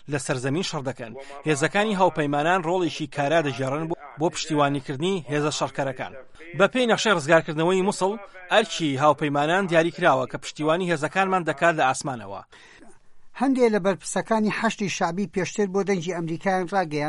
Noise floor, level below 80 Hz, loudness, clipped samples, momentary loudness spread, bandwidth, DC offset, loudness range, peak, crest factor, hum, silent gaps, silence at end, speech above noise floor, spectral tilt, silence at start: -44 dBFS; -58 dBFS; -23 LUFS; under 0.1%; 9 LU; 11.5 kHz; under 0.1%; 4 LU; -4 dBFS; 18 dB; none; none; 0 s; 20 dB; -5 dB/octave; 0 s